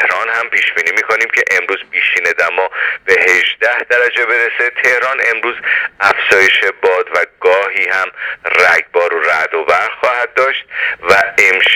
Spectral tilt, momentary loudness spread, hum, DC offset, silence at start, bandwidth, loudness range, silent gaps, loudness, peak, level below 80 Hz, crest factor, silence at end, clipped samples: -1 dB/octave; 6 LU; none; under 0.1%; 0 s; 19 kHz; 1 LU; none; -12 LUFS; 0 dBFS; -56 dBFS; 12 dB; 0 s; 0.1%